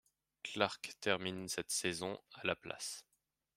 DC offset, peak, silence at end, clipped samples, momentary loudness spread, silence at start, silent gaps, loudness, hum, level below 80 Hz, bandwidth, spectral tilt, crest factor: under 0.1%; -14 dBFS; 0.55 s; under 0.1%; 8 LU; 0.45 s; none; -39 LUFS; none; -76 dBFS; 16 kHz; -2.5 dB/octave; 26 dB